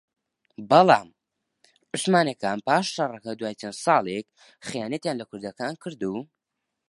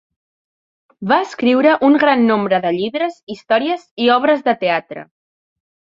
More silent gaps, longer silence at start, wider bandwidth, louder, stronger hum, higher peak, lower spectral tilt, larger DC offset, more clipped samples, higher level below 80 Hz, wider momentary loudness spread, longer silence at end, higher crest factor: second, none vs 3.23-3.27 s, 3.91-3.97 s; second, 0.6 s vs 1 s; first, 11.5 kHz vs 7.6 kHz; second, -24 LUFS vs -15 LUFS; neither; about the same, -2 dBFS vs -2 dBFS; second, -4.5 dB/octave vs -6 dB/octave; neither; neither; second, -70 dBFS vs -62 dBFS; first, 16 LU vs 11 LU; second, 0.65 s vs 0.95 s; first, 24 dB vs 16 dB